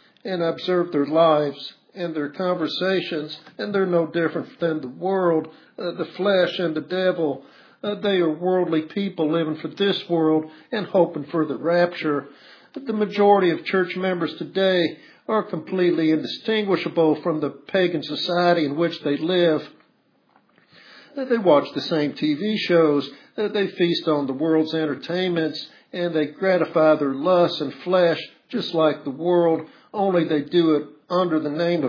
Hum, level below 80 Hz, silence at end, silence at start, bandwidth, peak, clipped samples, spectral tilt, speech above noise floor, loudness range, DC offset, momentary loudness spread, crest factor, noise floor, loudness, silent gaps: none; -80 dBFS; 0 s; 0.25 s; 5.4 kHz; -4 dBFS; under 0.1%; -7.5 dB/octave; 41 dB; 3 LU; under 0.1%; 10 LU; 18 dB; -63 dBFS; -22 LUFS; none